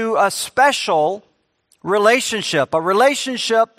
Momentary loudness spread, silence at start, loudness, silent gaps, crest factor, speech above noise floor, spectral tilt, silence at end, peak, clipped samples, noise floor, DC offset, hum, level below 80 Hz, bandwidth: 6 LU; 0 s; -17 LUFS; none; 18 dB; 45 dB; -2.5 dB/octave; 0.15 s; 0 dBFS; under 0.1%; -62 dBFS; under 0.1%; none; -64 dBFS; 15.5 kHz